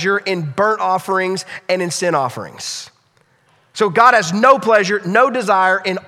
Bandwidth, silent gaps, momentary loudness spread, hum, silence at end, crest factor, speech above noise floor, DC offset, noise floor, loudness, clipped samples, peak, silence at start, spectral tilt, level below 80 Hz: 15.5 kHz; none; 14 LU; none; 0.05 s; 16 dB; 42 dB; under 0.1%; -57 dBFS; -15 LUFS; under 0.1%; 0 dBFS; 0 s; -4 dB/octave; -64 dBFS